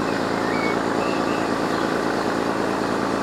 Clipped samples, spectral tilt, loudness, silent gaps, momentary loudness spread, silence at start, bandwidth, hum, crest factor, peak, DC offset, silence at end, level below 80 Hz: under 0.1%; -5 dB/octave; -22 LUFS; none; 1 LU; 0 s; 16 kHz; none; 14 dB; -8 dBFS; under 0.1%; 0 s; -50 dBFS